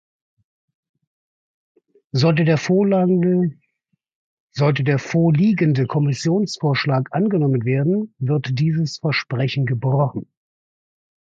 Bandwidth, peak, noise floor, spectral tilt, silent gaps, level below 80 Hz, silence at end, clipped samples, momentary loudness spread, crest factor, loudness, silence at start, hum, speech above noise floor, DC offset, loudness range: 7.8 kHz; -6 dBFS; -72 dBFS; -7 dB/octave; 4.15-4.48 s; -60 dBFS; 1.05 s; under 0.1%; 6 LU; 14 dB; -19 LUFS; 2.15 s; none; 54 dB; under 0.1%; 3 LU